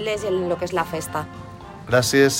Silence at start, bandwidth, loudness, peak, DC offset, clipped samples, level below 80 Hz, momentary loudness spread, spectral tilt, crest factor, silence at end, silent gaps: 0 s; 16.5 kHz; -22 LUFS; -4 dBFS; under 0.1%; under 0.1%; -50 dBFS; 20 LU; -4 dB/octave; 18 dB; 0 s; none